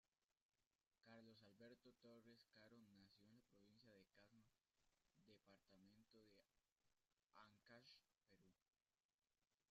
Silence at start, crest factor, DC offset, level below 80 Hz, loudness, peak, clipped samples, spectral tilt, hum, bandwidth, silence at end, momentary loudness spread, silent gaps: 0.05 s; 20 dB; under 0.1%; under -90 dBFS; -69 LUFS; -54 dBFS; under 0.1%; -3.5 dB/octave; none; 7.2 kHz; 0.1 s; 2 LU; 0.42-0.49 s, 0.67-0.71 s, 6.72-6.76 s, 8.62-8.66 s, 9.05-9.19 s, 9.54-9.58 s